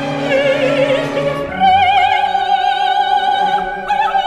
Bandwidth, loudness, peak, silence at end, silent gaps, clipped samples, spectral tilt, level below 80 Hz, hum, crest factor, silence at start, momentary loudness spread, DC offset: 10.5 kHz; -14 LUFS; -2 dBFS; 0 s; none; under 0.1%; -4.5 dB/octave; -44 dBFS; none; 12 dB; 0 s; 7 LU; under 0.1%